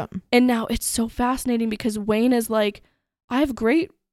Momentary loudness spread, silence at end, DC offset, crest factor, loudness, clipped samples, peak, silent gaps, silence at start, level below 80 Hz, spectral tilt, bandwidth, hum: 5 LU; 0.25 s; under 0.1%; 18 dB; -22 LUFS; under 0.1%; -4 dBFS; 3.24-3.28 s; 0 s; -44 dBFS; -4 dB/octave; 15 kHz; none